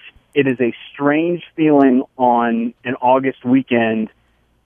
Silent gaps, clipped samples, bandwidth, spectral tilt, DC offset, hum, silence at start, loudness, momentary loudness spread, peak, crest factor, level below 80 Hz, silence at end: none; under 0.1%; 3.6 kHz; -9 dB/octave; under 0.1%; none; 0.05 s; -17 LUFS; 9 LU; 0 dBFS; 16 dB; -62 dBFS; 0.6 s